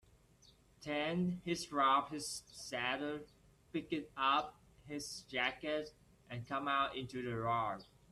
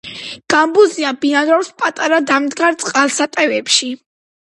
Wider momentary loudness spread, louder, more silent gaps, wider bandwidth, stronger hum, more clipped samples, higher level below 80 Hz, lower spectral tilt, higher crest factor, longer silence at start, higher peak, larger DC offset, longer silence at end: first, 14 LU vs 8 LU; second, -38 LUFS vs -14 LUFS; neither; first, 13 kHz vs 11.5 kHz; neither; neither; second, -70 dBFS vs -64 dBFS; first, -4 dB/octave vs -1.5 dB/octave; about the same, 20 dB vs 16 dB; first, 0.8 s vs 0.05 s; second, -20 dBFS vs 0 dBFS; neither; second, 0.3 s vs 0.65 s